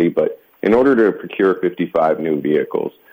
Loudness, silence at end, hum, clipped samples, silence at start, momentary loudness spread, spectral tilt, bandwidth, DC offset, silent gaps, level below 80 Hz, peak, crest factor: -17 LUFS; 0.2 s; none; under 0.1%; 0 s; 9 LU; -8.5 dB/octave; 16 kHz; under 0.1%; none; -56 dBFS; -4 dBFS; 12 dB